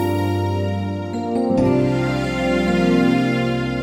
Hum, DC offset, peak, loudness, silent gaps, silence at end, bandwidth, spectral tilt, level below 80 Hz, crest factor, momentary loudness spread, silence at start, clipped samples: none; under 0.1%; -4 dBFS; -19 LUFS; none; 0 s; 16.5 kHz; -7 dB/octave; -40 dBFS; 14 dB; 7 LU; 0 s; under 0.1%